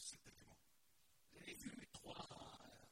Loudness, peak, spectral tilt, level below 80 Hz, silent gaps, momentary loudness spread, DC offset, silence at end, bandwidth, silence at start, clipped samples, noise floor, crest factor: -57 LUFS; -40 dBFS; -2.5 dB/octave; -76 dBFS; none; 12 LU; under 0.1%; 0 s; 16 kHz; 0 s; under 0.1%; -79 dBFS; 20 dB